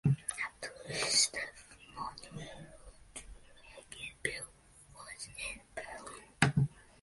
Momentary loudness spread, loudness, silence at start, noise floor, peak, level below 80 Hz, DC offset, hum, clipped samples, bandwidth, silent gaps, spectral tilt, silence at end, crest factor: 22 LU; -35 LUFS; 0.05 s; -60 dBFS; -10 dBFS; -60 dBFS; under 0.1%; none; under 0.1%; 12 kHz; none; -3 dB/octave; 0.2 s; 28 dB